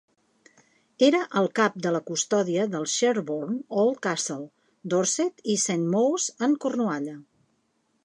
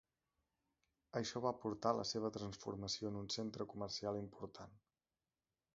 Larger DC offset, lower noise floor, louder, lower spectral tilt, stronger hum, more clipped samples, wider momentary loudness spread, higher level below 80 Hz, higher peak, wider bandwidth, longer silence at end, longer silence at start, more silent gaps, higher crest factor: neither; second, -71 dBFS vs under -90 dBFS; first, -25 LUFS vs -44 LUFS; about the same, -4 dB/octave vs -4.5 dB/octave; neither; neither; second, 8 LU vs 12 LU; second, -80 dBFS vs -72 dBFS; first, -6 dBFS vs -22 dBFS; first, 11.5 kHz vs 7.6 kHz; second, 0.85 s vs 1 s; second, 1 s vs 1.15 s; neither; about the same, 20 dB vs 24 dB